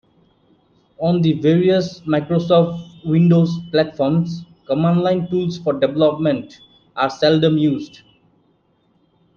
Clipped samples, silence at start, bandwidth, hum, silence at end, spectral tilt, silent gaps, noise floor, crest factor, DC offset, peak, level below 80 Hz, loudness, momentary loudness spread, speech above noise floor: under 0.1%; 1 s; 6.8 kHz; none; 1.5 s; -8 dB/octave; none; -61 dBFS; 16 dB; under 0.1%; -2 dBFS; -56 dBFS; -18 LUFS; 10 LU; 44 dB